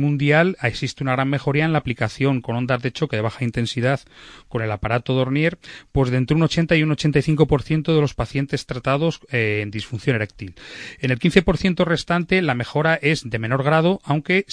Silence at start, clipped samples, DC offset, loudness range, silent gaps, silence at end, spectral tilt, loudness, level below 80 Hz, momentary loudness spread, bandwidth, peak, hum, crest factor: 0 s; under 0.1%; under 0.1%; 4 LU; none; 0 s; -6.5 dB/octave; -20 LUFS; -42 dBFS; 8 LU; 10.5 kHz; 0 dBFS; none; 20 dB